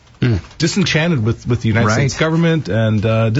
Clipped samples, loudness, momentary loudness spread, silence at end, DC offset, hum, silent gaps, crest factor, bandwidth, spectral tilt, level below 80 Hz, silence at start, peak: under 0.1%; -16 LUFS; 4 LU; 0 s; under 0.1%; none; none; 12 dB; 8 kHz; -6 dB/octave; -38 dBFS; 0.2 s; -4 dBFS